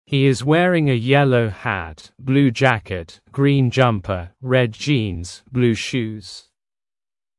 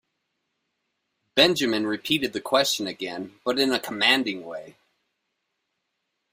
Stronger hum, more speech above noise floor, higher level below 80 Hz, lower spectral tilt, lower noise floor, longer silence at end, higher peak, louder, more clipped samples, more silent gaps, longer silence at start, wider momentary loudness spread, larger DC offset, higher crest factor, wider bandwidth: neither; first, over 72 dB vs 54 dB; first, -50 dBFS vs -68 dBFS; first, -6.5 dB/octave vs -3 dB/octave; first, under -90 dBFS vs -79 dBFS; second, 1 s vs 1.6 s; first, 0 dBFS vs -4 dBFS; first, -18 LUFS vs -23 LUFS; neither; neither; second, 0.1 s vs 1.35 s; about the same, 15 LU vs 13 LU; neither; second, 18 dB vs 24 dB; second, 11.5 kHz vs 16 kHz